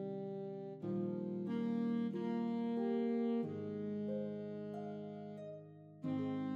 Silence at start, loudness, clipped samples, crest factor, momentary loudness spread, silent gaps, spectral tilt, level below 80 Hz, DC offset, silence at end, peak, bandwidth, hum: 0 s; -41 LUFS; under 0.1%; 12 dB; 11 LU; none; -9.5 dB/octave; under -90 dBFS; under 0.1%; 0 s; -28 dBFS; 5.2 kHz; none